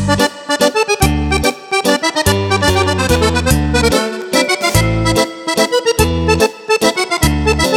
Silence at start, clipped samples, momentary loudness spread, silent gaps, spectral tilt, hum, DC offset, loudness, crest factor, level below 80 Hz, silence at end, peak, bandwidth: 0 s; under 0.1%; 3 LU; none; -4 dB/octave; none; under 0.1%; -13 LUFS; 14 dB; -24 dBFS; 0 s; 0 dBFS; 17.5 kHz